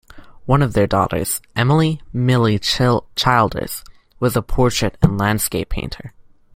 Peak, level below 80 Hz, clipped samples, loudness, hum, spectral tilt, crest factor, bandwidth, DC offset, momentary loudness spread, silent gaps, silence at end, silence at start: -2 dBFS; -32 dBFS; under 0.1%; -18 LUFS; none; -5 dB/octave; 16 dB; 16.5 kHz; under 0.1%; 11 LU; none; 0.45 s; 0.15 s